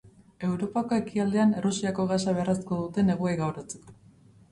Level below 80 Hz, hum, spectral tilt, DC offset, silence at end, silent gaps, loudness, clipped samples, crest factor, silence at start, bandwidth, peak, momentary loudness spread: -60 dBFS; none; -6.5 dB/octave; under 0.1%; 0.6 s; none; -27 LUFS; under 0.1%; 14 dB; 0.05 s; 11.5 kHz; -14 dBFS; 9 LU